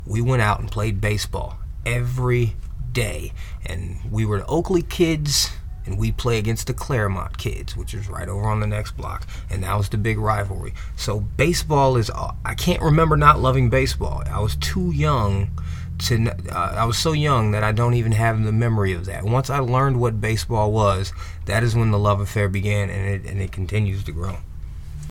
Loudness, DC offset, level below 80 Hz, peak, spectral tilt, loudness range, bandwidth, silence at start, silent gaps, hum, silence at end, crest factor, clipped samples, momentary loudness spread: -21 LUFS; under 0.1%; -30 dBFS; 0 dBFS; -5.5 dB/octave; 6 LU; 17 kHz; 0 s; none; none; 0 s; 20 dB; under 0.1%; 12 LU